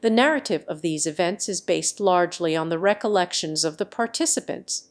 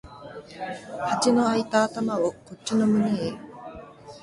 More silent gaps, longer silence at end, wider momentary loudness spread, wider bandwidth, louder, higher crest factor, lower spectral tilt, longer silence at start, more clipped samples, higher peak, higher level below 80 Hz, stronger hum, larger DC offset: neither; about the same, 0.1 s vs 0.05 s; second, 6 LU vs 20 LU; about the same, 11 kHz vs 11.5 kHz; about the same, -23 LUFS vs -25 LUFS; about the same, 20 dB vs 18 dB; second, -3 dB/octave vs -5 dB/octave; about the same, 0 s vs 0.05 s; neither; first, -4 dBFS vs -8 dBFS; second, -72 dBFS vs -60 dBFS; neither; neither